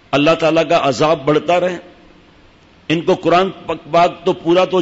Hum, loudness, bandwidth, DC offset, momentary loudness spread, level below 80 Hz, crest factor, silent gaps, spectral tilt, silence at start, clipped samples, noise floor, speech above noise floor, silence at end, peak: none; -15 LUFS; 8 kHz; under 0.1%; 8 LU; -50 dBFS; 12 dB; none; -5.5 dB/octave; 0.1 s; under 0.1%; -47 dBFS; 33 dB; 0 s; -4 dBFS